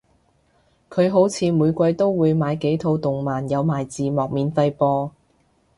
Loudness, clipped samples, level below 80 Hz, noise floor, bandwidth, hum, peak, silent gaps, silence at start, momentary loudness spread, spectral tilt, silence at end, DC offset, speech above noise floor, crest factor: -21 LUFS; under 0.1%; -54 dBFS; -62 dBFS; 11.5 kHz; none; -4 dBFS; none; 0.9 s; 6 LU; -7.5 dB/octave; 0.7 s; under 0.1%; 42 dB; 16 dB